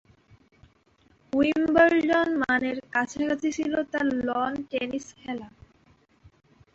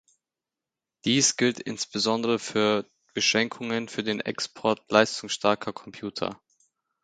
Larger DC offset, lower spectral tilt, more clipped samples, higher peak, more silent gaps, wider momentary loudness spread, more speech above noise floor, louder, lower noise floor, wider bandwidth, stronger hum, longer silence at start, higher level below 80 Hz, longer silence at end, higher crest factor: neither; first, -4.5 dB/octave vs -3 dB/octave; neither; second, -8 dBFS vs -2 dBFS; neither; first, 15 LU vs 11 LU; second, 38 dB vs 63 dB; about the same, -25 LUFS vs -26 LUFS; second, -63 dBFS vs -89 dBFS; second, 8 kHz vs 9.6 kHz; neither; first, 1.35 s vs 1.05 s; first, -58 dBFS vs -68 dBFS; first, 1.25 s vs 0.7 s; second, 20 dB vs 26 dB